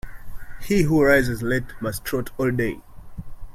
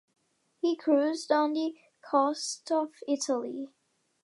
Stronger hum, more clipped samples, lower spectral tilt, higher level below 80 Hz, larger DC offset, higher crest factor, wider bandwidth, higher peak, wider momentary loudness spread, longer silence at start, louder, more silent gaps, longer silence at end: neither; neither; first, -6 dB/octave vs -2 dB/octave; first, -38 dBFS vs -88 dBFS; neither; about the same, 20 dB vs 18 dB; first, 16.5 kHz vs 11.5 kHz; first, -2 dBFS vs -12 dBFS; first, 24 LU vs 9 LU; second, 0.05 s vs 0.65 s; first, -22 LUFS vs -29 LUFS; neither; second, 0 s vs 0.55 s